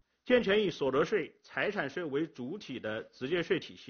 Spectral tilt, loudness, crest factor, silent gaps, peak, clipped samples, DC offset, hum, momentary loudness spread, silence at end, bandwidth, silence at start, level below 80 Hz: -3.5 dB/octave; -33 LUFS; 18 dB; none; -14 dBFS; under 0.1%; under 0.1%; none; 11 LU; 0 s; 6.8 kHz; 0.25 s; -66 dBFS